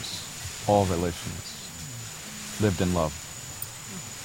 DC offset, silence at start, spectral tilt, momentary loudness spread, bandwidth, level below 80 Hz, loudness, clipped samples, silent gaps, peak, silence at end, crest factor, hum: under 0.1%; 0 s; -4.5 dB/octave; 13 LU; 16.5 kHz; -48 dBFS; -29 LUFS; under 0.1%; none; -8 dBFS; 0 s; 22 dB; none